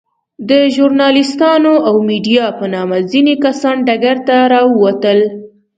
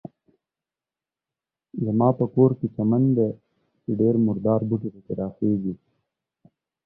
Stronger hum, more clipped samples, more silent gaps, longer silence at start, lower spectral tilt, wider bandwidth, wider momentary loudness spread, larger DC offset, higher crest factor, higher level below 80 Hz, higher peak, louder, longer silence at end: neither; neither; neither; second, 0.4 s vs 1.75 s; second, -5.5 dB/octave vs -15 dB/octave; first, 9 kHz vs 1.6 kHz; second, 7 LU vs 12 LU; neither; second, 12 dB vs 20 dB; about the same, -60 dBFS vs -60 dBFS; first, 0 dBFS vs -6 dBFS; first, -11 LUFS vs -23 LUFS; second, 0.3 s vs 1.1 s